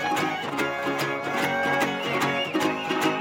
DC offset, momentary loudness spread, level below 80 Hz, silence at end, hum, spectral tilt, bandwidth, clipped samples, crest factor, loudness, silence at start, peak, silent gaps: under 0.1%; 3 LU; -66 dBFS; 0 s; none; -4 dB/octave; 17 kHz; under 0.1%; 14 dB; -25 LUFS; 0 s; -10 dBFS; none